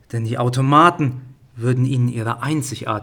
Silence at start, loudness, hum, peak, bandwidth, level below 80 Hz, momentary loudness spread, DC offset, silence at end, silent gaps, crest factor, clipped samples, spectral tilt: 0.15 s; -18 LUFS; none; -2 dBFS; 17 kHz; -56 dBFS; 12 LU; under 0.1%; 0 s; none; 18 dB; under 0.1%; -6.5 dB/octave